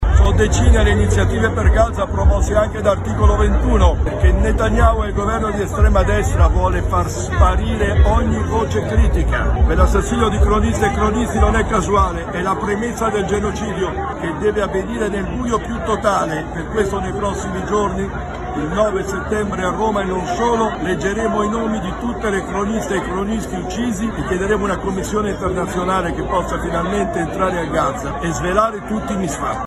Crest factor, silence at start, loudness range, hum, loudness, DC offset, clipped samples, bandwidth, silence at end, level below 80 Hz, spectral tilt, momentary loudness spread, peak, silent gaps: 16 dB; 0 s; 4 LU; none; -18 LUFS; under 0.1%; under 0.1%; 12.5 kHz; 0 s; -20 dBFS; -6 dB/octave; 7 LU; -2 dBFS; none